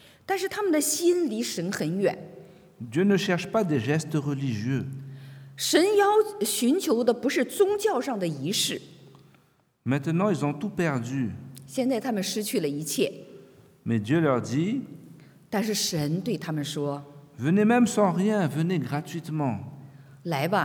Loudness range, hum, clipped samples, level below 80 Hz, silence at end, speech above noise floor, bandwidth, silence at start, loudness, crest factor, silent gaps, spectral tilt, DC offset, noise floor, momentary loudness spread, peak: 5 LU; none; under 0.1%; -70 dBFS; 0 s; 38 dB; over 20 kHz; 0.3 s; -26 LUFS; 20 dB; none; -5 dB/octave; under 0.1%; -64 dBFS; 12 LU; -6 dBFS